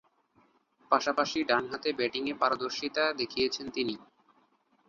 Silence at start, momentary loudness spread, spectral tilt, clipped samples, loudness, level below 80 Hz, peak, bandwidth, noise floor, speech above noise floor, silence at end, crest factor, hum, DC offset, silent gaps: 0.9 s; 6 LU; -3 dB/octave; under 0.1%; -30 LUFS; -68 dBFS; -8 dBFS; 7.4 kHz; -68 dBFS; 38 dB; 0.85 s; 24 dB; none; under 0.1%; none